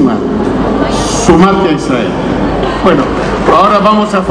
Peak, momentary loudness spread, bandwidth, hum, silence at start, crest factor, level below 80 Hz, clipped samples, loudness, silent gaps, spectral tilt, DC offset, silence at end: 0 dBFS; 6 LU; 11 kHz; none; 0 s; 10 dB; -26 dBFS; 2%; -9 LUFS; none; -5.5 dB/octave; under 0.1%; 0 s